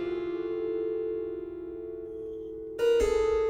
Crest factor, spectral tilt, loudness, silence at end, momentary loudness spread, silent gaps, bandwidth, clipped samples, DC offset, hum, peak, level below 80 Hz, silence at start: 14 dB; -5.5 dB/octave; -31 LUFS; 0 s; 14 LU; none; 13.5 kHz; under 0.1%; under 0.1%; none; -16 dBFS; -48 dBFS; 0 s